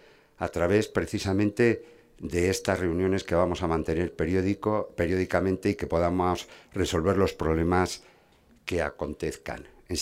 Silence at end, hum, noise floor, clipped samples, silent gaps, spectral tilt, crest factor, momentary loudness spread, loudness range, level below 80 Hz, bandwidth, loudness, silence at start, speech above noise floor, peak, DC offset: 0 s; none; -60 dBFS; under 0.1%; none; -6 dB/octave; 20 dB; 9 LU; 2 LU; -48 dBFS; 16 kHz; -27 LUFS; 0.4 s; 33 dB; -8 dBFS; under 0.1%